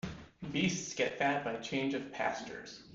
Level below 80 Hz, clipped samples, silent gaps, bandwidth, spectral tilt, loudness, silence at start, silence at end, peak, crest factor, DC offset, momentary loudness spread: -64 dBFS; under 0.1%; none; 7.8 kHz; -4 dB/octave; -35 LUFS; 0.05 s; 0 s; -18 dBFS; 18 dB; under 0.1%; 13 LU